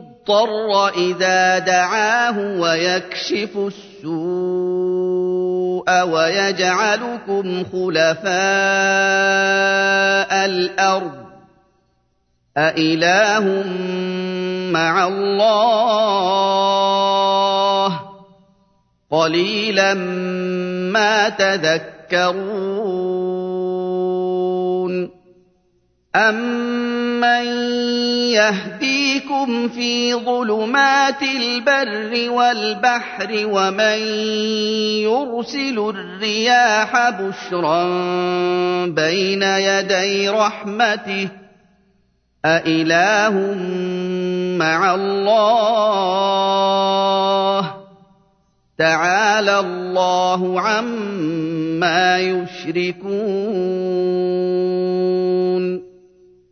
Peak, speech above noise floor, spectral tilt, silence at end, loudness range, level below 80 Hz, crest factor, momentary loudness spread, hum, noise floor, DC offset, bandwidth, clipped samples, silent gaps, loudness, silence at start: -2 dBFS; 47 dB; -4 dB/octave; 0.65 s; 4 LU; -66 dBFS; 16 dB; 8 LU; none; -64 dBFS; under 0.1%; 6.6 kHz; under 0.1%; none; -17 LUFS; 0 s